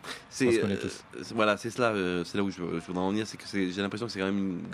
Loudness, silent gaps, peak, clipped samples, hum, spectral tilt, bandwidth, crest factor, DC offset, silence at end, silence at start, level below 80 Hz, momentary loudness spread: -30 LUFS; none; -8 dBFS; under 0.1%; none; -5 dB/octave; 14 kHz; 22 dB; under 0.1%; 0 s; 0 s; -68 dBFS; 8 LU